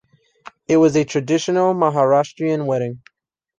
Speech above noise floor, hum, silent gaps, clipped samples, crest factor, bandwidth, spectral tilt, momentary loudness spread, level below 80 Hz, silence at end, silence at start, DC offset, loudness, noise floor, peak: 28 dB; none; none; under 0.1%; 16 dB; 9.2 kHz; -6 dB/octave; 10 LU; -60 dBFS; 0.6 s; 0.7 s; under 0.1%; -18 LUFS; -45 dBFS; -2 dBFS